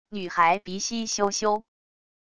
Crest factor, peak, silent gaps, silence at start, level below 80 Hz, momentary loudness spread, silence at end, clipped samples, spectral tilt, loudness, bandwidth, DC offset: 18 dB; -8 dBFS; none; 0.05 s; -64 dBFS; 8 LU; 0.7 s; under 0.1%; -2.5 dB/octave; -25 LUFS; 11 kHz; 0.4%